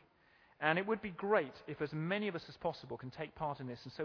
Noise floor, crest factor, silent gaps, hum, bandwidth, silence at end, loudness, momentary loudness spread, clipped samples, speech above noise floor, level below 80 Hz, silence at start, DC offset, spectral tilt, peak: -68 dBFS; 24 dB; none; none; 5.4 kHz; 0 s; -39 LUFS; 12 LU; under 0.1%; 30 dB; -70 dBFS; 0.6 s; under 0.1%; -4 dB/octave; -16 dBFS